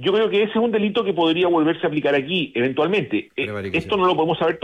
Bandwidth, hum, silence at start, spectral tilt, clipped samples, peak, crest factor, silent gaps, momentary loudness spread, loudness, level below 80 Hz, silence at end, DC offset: 8.6 kHz; none; 0 s; -7 dB/octave; under 0.1%; -8 dBFS; 12 dB; none; 6 LU; -20 LUFS; -58 dBFS; 0.05 s; under 0.1%